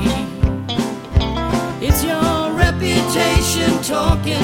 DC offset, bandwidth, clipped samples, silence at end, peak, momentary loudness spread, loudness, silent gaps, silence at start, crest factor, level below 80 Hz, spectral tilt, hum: under 0.1%; 17 kHz; under 0.1%; 0 s; 0 dBFS; 5 LU; -17 LUFS; none; 0 s; 16 dB; -24 dBFS; -5 dB/octave; none